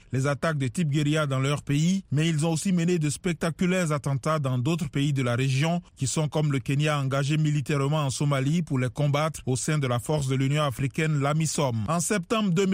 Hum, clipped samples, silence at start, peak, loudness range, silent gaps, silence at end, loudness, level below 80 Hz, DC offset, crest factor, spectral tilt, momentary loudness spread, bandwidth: none; under 0.1%; 0.1 s; -12 dBFS; 1 LU; none; 0 s; -26 LUFS; -54 dBFS; under 0.1%; 14 dB; -5.5 dB/octave; 3 LU; 16 kHz